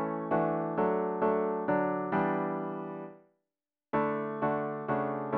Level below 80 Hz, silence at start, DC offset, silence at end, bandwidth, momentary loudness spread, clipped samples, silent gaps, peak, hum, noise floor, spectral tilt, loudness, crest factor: -68 dBFS; 0 s; under 0.1%; 0 s; 4.5 kHz; 8 LU; under 0.1%; none; -16 dBFS; none; under -90 dBFS; -7 dB/octave; -31 LUFS; 16 dB